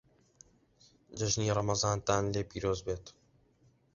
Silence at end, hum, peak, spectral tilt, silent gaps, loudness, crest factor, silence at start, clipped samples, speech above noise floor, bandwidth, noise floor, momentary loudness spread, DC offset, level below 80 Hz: 0.85 s; none; -12 dBFS; -5 dB/octave; none; -33 LUFS; 22 dB; 1.1 s; under 0.1%; 36 dB; 7.6 kHz; -68 dBFS; 10 LU; under 0.1%; -54 dBFS